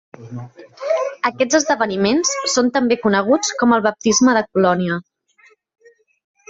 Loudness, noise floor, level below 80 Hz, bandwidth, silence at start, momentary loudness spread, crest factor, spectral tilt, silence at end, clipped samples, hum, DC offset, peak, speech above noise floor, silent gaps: -17 LUFS; -54 dBFS; -58 dBFS; 8 kHz; 0.2 s; 13 LU; 16 dB; -3.5 dB/octave; 1.5 s; under 0.1%; none; under 0.1%; -2 dBFS; 37 dB; none